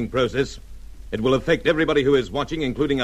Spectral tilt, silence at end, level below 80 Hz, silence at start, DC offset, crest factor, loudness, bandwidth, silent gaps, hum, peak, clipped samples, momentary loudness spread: -6 dB/octave; 0 s; -40 dBFS; 0 s; under 0.1%; 16 dB; -21 LUFS; 12.5 kHz; none; none; -6 dBFS; under 0.1%; 9 LU